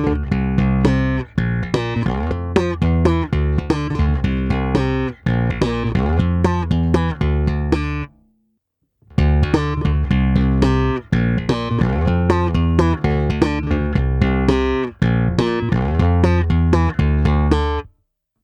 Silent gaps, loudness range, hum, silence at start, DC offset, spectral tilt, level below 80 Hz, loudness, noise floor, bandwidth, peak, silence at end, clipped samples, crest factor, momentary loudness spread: none; 3 LU; none; 0 s; under 0.1%; -8 dB/octave; -24 dBFS; -18 LUFS; -70 dBFS; 9 kHz; 0 dBFS; 0.6 s; under 0.1%; 18 dB; 5 LU